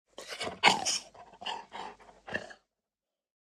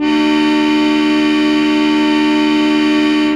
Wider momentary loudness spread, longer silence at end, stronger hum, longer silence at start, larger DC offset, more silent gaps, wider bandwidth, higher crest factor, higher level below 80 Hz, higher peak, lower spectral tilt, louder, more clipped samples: first, 24 LU vs 0 LU; first, 1.05 s vs 0 s; neither; first, 0.2 s vs 0 s; neither; neither; first, 16 kHz vs 9.6 kHz; first, 30 dB vs 10 dB; second, -72 dBFS vs -46 dBFS; about the same, -4 dBFS vs -2 dBFS; second, -1 dB/octave vs -4 dB/octave; second, -31 LUFS vs -12 LUFS; neither